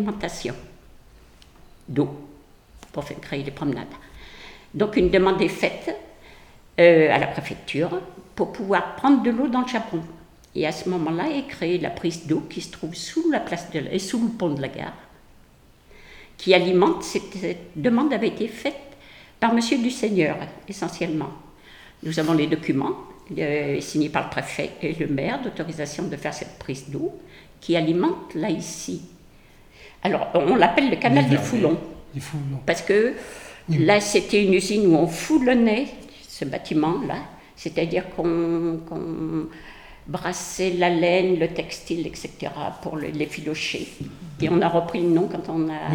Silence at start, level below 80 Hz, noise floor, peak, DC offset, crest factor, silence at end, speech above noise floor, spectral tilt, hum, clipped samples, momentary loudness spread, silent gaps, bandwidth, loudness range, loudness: 0 s; -50 dBFS; -53 dBFS; -2 dBFS; under 0.1%; 22 dB; 0 s; 30 dB; -5.5 dB/octave; none; under 0.1%; 16 LU; none; 18.5 kHz; 7 LU; -23 LUFS